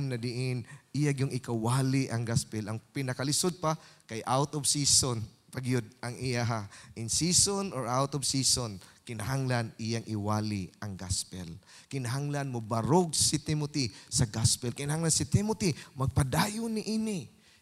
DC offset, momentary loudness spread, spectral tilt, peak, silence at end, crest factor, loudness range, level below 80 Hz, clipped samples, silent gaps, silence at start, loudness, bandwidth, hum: under 0.1%; 13 LU; -4 dB/octave; -10 dBFS; 0.35 s; 20 dB; 4 LU; -54 dBFS; under 0.1%; none; 0 s; -30 LUFS; 15.5 kHz; none